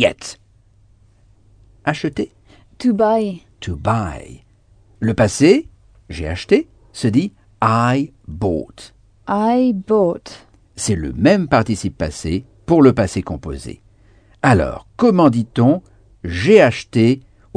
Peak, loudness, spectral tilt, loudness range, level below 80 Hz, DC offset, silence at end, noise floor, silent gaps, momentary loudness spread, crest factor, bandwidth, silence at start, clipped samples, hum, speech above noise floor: 0 dBFS; -17 LUFS; -6.5 dB/octave; 6 LU; -40 dBFS; under 0.1%; 0.35 s; -52 dBFS; none; 17 LU; 18 dB; 10 kHz; 0 s; under 0.1%; none; 36 dB